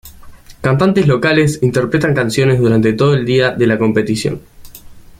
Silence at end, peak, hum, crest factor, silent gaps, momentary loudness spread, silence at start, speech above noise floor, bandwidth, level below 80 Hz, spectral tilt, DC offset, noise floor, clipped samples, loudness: 0.2 s; 0 dBFS; none; 12 dB; none; 6 LU; 0.05 s; 23 dB; 15.5 kHz; -42 dBFS; -6.5 dB/octave; under 0.1%; -36 dBFS; under 0.1%; -13 LUFS